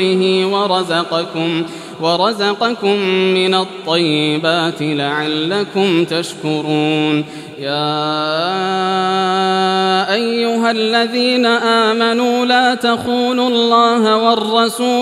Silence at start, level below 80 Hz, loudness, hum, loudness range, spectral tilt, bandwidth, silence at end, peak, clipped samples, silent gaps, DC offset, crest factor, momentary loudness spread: 0 s; -66 dBFS; -15 LUFS; none; 4 LU; -4.5 dB/octave; 14 kHz; 0 s; 0 dBFS; under 0.1%; none; under 0.1%; 14 dB; 6 LU